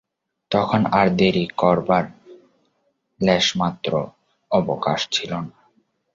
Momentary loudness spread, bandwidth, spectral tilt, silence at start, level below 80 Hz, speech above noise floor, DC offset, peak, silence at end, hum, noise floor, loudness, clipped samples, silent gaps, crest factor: 11 LU; 7.6 kHz; -5 dB/octave; 0.5 s; -52 dBFS; 50 dB; under 0.1%; -2 dBFS; 0.65 s; none; -69 dBFS; -20 LUFS; under 0.1%; none; 20 dB